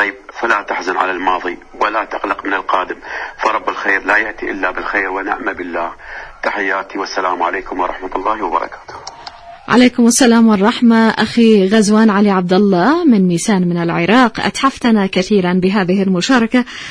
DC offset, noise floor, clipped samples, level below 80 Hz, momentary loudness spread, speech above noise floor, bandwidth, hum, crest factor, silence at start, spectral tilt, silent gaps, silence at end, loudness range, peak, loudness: under 0.1%; -34 dBFS; under 0.1%; -44 dBFS; 12 LU; 20 dB; 11 kHz; none; 14 dB; 0 s; -5 dB/octave; none; 0 s; 8 LU; 0 dBFS; -14 LUFS